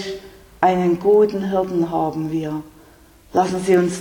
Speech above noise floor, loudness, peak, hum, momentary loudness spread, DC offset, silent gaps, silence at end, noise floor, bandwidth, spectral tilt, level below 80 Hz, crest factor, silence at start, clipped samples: 30 dB; -19 LUFS; -2 dBFS; none; 12 LU; under 0.1%; none; 0 s; -48 dBFS; 18.5 kHz; -6.5 dB/octave; -50 dBFS; 18 dB; 0 s; under 0.1%